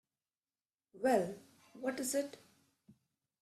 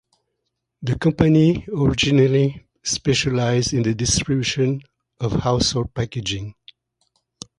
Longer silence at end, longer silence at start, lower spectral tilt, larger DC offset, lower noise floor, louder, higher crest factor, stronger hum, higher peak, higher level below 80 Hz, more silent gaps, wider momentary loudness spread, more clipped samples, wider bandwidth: second, 0.5 s vs 1.1 s; first, 0.95 s vs 0.8 s; about the same, -4 dB/octave vs -5 dB/octave; neither; first, under -90 dBFS vs -77 dBFS; second, -37 LUFS vs -20 LUFS; about the same, 22 dB vs 20 dB; neither; second, -20 dBFS vs 0 dBFS; second, -80 dBFS vs -40 dBFS; neither; first, 17 LU vs 13 LU; neither; first, 14.5 kHz vs 11 kHz